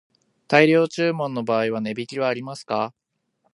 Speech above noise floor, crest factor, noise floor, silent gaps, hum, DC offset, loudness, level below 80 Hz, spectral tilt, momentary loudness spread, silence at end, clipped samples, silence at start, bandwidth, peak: 49 dB; 22 dB; -70 dBFS; none; none; under 0.1%; -22 LUFS; -72 dBFS; -6 dB/octave; 12 LU; 0.65 s; under 0.1%; 0.5 s; 11.5 kHz; 0 dBFS